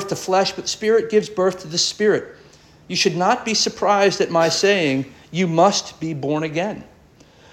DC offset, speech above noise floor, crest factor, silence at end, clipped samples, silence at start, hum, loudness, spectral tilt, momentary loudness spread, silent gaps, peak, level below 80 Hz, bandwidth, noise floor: under 0.1%; 31 dB; 16 dB; 0.7 s; under 0.1%; 0 s; none; -19 LUFS; -3.5 dB/octave; 9 LU; none; -4 dBFS; -58 dBFS; 14 kHz; -50 dBFS